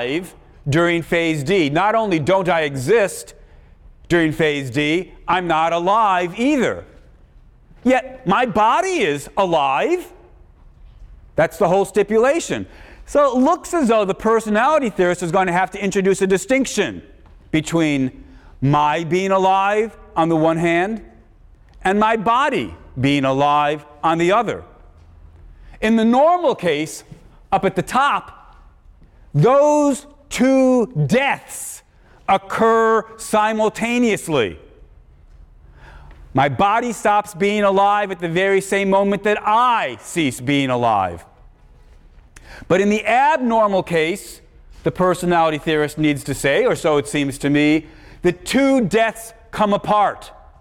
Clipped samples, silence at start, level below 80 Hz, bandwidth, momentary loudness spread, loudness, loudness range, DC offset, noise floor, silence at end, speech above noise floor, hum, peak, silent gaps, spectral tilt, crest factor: under 0.1%; 0 s; -46 dBFS; 17 kHz; 9 LU; -18 LUFS; 3 LU; under 0.1%; -47 dBFS; 0.3 s; 30 dB; none; -6 dBFS; none; -5.5 dB/octave; 14 dB